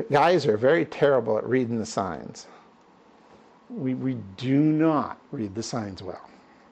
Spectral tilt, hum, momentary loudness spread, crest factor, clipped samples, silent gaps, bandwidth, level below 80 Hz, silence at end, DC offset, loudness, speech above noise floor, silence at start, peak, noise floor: -6.5 dB/octave; none; 18 LU; 16 dB; under 0.1%; none; 8.8 kHz; -66 dBFS; 0.5 s; under 0.1%; -25 LUFS; 31 dB; 0 s; -10 dBFS; -55 dBFS